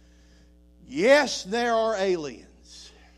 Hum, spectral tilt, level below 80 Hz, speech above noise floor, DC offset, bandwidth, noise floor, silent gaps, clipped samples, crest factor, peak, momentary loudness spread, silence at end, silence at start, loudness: none; -3.5 dB/octave; -56 dBFS; 31 dB; under 0.1%; 13.5 kHz; -55 dBFS; none; under 0.1%; 20 dB; -6 dBFS; 18 LU; 0.3 s; 0.9 s; -23 LUFS